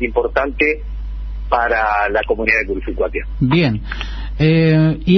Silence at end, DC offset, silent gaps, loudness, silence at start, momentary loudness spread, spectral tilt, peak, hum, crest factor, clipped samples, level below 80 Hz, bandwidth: 0 s; under 0.1%; none; -17 LUFS; 0 s; 13 LU; -8 dB/octave; 0 dBFS; none; 16 dB; under 0.1%; -28 dBFS; 6.2 kHz